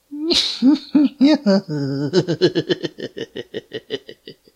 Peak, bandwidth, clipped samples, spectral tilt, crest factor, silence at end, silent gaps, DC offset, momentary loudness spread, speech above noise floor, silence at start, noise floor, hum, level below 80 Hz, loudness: -2 dBFS; 11.5 kHz; under 0.1%; -5.5 dB/octave; 18 dB; 0.25 s; none; under 0.1%; 16 LU; 22 dB; 0.1 s; -42 dBFS; none; -58 dBFS; -18 LUFS